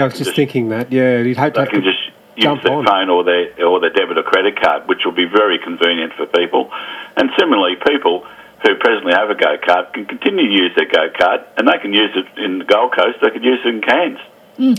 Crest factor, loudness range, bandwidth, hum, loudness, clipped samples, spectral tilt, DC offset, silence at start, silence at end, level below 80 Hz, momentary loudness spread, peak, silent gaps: 14 dB; 1 LU; 14 kHz; none; -14 LUFS; under 0.1%; -5 dB/octave; under 0.1%; 0 s; 0 s; -58 dBFS; 6 LU; 0 dBFS; none